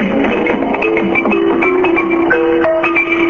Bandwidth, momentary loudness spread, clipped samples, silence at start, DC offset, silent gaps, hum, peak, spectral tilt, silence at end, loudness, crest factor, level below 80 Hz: 6.8 kHz; 2 LU; under 0.1%; 0 s; under 0.1%; none; none; 0 dBFS; -7 dB/octave; 0 s; -12 LUFS; 12 dB; -42 dBFS